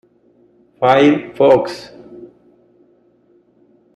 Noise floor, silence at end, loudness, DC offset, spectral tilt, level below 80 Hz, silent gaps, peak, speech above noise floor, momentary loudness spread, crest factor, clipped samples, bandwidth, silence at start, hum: -54 dBFS; 1.7 s; -14 LUFS; under 0.1%; -6.5 dB/octave; -58 dBFS; none; -2 dBFS; 42 dB; 24 LU; 16 dB; under 0.1%; 10.5 kHz; 0.8 s; none